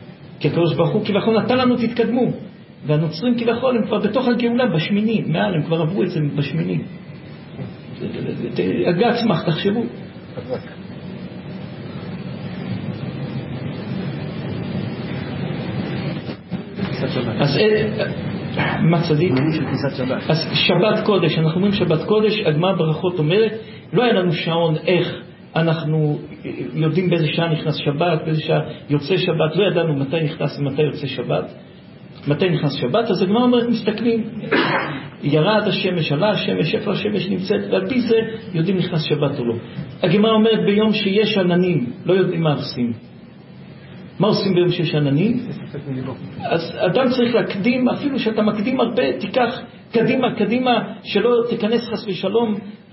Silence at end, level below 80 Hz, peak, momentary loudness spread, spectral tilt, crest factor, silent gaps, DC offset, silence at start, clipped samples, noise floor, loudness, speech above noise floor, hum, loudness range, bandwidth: 0.15 s; -52 dBFS; -2 dBFS; 13 LU; -10.5 dB/octave; 18 dB; none; under 0.1%; 0 s; under 0.1%; -40 dBFS; -19 LUFS; 22 dB; none; 8 LU; 5.8 kHz